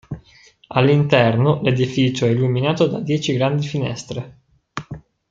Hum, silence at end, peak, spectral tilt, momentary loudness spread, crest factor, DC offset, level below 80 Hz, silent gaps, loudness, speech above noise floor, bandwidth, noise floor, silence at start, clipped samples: none; 0.3 s; -2 dBFS; -6.5 dB/octave; 20 LU; 18 dB; under 0.1%; -52 dBFS; none; -18 LUFS; 33 dB; 7.8 kHz; -51 dBFS; 0.1 s; under 0.1%